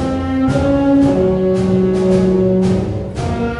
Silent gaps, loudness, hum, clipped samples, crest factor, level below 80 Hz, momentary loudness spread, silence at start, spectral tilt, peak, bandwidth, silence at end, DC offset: none; -14 LUFS; none; under 0.1%; 12 dB; -30 dBFS; 7 LU; 0 s; -8.5 dB/octave; -2 dBFS; 11 kHz; 0 s; under 0.1%